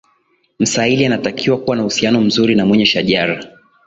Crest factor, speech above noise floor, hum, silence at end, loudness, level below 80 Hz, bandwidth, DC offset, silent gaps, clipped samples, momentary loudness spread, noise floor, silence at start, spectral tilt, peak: 14 dB; 46 dB; none; 0.4 s; -14 LUFS; -50 dBFS; 8 kHz; under 0.1%; none; under 0.1%; 5 LU; -60 dBFS; 0.6 s; -4.5 dB/octave; 0 dBFS